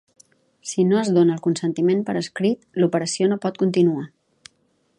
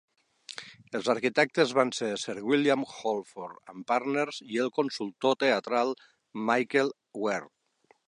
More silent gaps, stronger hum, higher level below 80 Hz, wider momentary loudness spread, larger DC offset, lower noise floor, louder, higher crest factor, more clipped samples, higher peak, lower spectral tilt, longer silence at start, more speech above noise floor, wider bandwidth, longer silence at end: neither; neither; first, -70 dBFS vs -80 dBFS; second, 9 LU vs 17 LU; neither; about the same, -66 dBFS vs -67 dBFS; first, -21 LUFS vs -28 LUFS; about the same, 16 dB vs 20 dB; neither; about the same, -6 dBFS vs -8 dBFS; first, -6 dB/octave vs -4 dB/octave; about the same, 0.65 s vs 0.6 s; first, 46 dB vs 38 dB; about the same, 11 kHz vs 11 kHz; first, 0.9 s vs 0.65 s